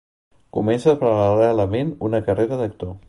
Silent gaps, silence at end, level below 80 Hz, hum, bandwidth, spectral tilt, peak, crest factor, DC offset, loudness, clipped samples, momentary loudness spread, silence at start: none; 0.1 s; -46 dBFS; none; 11.5 kHz; -8 dB/octave; -4 dBFS; 16 dB; under 0.1%; -20 LUFS; under 0.1%; 8 LU; 0.55 s